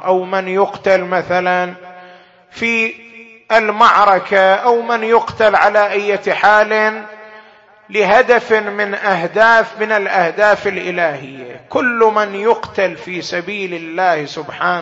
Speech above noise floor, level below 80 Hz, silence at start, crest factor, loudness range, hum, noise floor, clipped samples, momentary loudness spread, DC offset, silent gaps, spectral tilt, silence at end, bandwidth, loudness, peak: 30 dB; -56 dBFS; 0 s; 14 dB; 5 LU; none; -44 dBFS; under 0.1%; 11 LU; under 0.1%; none; -4.5 dB/octave; 0 s; 8 kHz; -14 LUFS; 0 dBFS